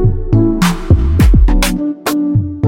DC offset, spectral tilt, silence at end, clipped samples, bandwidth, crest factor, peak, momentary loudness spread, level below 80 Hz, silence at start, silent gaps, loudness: under 0.1%; -6.5 dB/octave; 0 s; under 0.1%; 16.5 kHz; 10 dB; 0 dBFS; 6 LU; -14 dBFS; 0 s; none; -13 LUFS